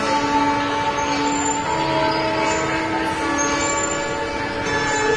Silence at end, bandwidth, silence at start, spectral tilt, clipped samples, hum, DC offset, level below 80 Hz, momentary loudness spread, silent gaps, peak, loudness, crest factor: 0 s; 11 kHz; 0 s; -3 dB/octave; under 0.1%; none; under 0.1%; -42 dBFS; 3 LU; none; -6 dBFS; -20 LUFS; 14 dB